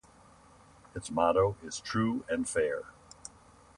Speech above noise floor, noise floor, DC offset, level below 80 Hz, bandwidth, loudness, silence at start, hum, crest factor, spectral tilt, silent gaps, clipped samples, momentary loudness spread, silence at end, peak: 28 dB; -58 dBFS; under 0.1%; -58 dBFS; 11.5 kHz; -31 LUFS; 0.95 s; none; 20 dB; -5 dB/octave; none; under 0.1%; 21 LU; 0.5 s; -14 dBFS